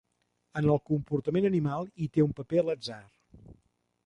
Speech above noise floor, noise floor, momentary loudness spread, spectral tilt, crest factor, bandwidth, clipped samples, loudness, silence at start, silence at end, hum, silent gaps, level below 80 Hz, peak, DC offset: 48 dB; -77 dBFS; 10 LU; -8.5 dB/octave; 18 dB; 10.5 kHz; under 0.1%; -29 LUFS; 0.55 s; 0.55 s; none; none; -60 dBFS; -12 dBFS; under 0.1%